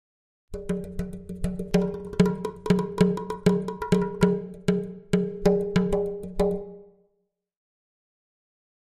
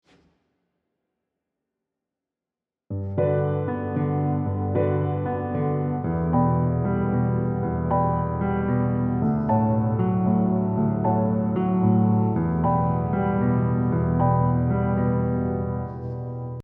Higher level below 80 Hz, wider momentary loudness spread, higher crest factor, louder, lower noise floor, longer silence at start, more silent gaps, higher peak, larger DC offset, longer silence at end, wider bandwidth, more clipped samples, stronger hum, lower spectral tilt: about the same, -42 dBFS vs -42 dBFS; first, 10 LU vs 6 LU; first, 20 dB vs 14 dB; second, -26 LUFS vs -23 LUFS; second, -75 dBFS vs -89 dBFS; second, 0.5 s vs 2.9 s; neither; about the same, -6 dBFS vs -8 dBFS; neither; first, 2.1 s vs 0 s; first, 13 kHz vs 3.2 kHz; neither; neither; second, -7.5 dB/octave vs -13.5 dB/octave